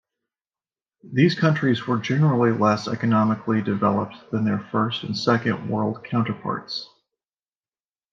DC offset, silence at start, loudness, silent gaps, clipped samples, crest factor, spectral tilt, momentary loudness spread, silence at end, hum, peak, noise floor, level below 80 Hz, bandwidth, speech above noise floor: under 0.1%; 1.05 s; -22 LUFS; none; under 0.1%; 18 dB; -7 dB/octave; 9 LU; 1.3 s; none; -4 dBFS; under -90 dBFS; -68 dBFS; 7.4 kHz; over 68 dB